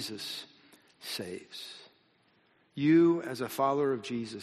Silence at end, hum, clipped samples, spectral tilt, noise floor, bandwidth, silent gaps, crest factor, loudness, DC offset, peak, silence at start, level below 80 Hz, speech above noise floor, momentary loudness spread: 0 s; none; under 0.1%; -5.5 dB/octave; -68 dBFS; 13 kHz; none; 18 dB; -30 LUFS; under 0.1%; -14 dBFS; 0 s; -76 dBFS; 38 dB; 22 LU